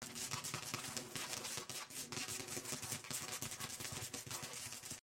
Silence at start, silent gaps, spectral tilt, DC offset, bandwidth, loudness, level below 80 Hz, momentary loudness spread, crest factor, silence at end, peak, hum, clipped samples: 0 s; none; -1.5 dB/octave; under 0.1%; 17 kHz; -44 LUFS; -76 dBFS; 3 LU; 24 dB; 0 s; -22 dBFS; none; under 0.1%